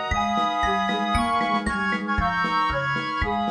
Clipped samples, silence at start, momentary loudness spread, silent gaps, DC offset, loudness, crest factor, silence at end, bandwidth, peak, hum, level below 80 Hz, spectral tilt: under 0.1%; 0 s; 2 LU; none; under 0.1%; -23 LUFS; 14 dB; 0 s; 10 kHz; -10 dBFS; none; -36 dBFS; -5 dB/octave